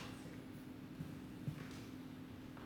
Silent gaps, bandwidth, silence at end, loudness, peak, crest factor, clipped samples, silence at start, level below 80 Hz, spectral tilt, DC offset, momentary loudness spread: none; 19 kHz; 0 s; -51 LUFS; -32 dBFS; 18 dB; under 0.1%; 0 s; -68 dBFS; -6 dB/octave; under 0.1%; 5 LU